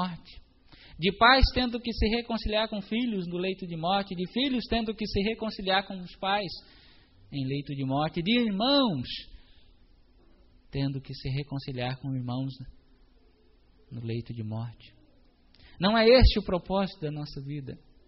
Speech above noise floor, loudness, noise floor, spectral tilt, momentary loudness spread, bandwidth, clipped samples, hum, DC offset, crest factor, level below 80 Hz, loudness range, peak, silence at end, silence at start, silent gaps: 33 dB; -28 LUFS; -60 dBFS; -3.5 dB/octave; 16 LU; 5.8 kHz; under 0.1%; none; under 0.1%; 22 dB; -38 dBFS; 10 LU; -6 dBFS; 0.3 s; 0 s; none